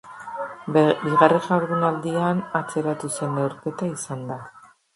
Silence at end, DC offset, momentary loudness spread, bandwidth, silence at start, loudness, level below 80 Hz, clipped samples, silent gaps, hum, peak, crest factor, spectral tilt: 0.35 s; under 0.1%; 15 LU; 11.5 kHz; 0.05 s; -23 LUFS; -66 dBFS; under 0.1%; none; none; 0 dBFS; 22 dB; -6 dB/octave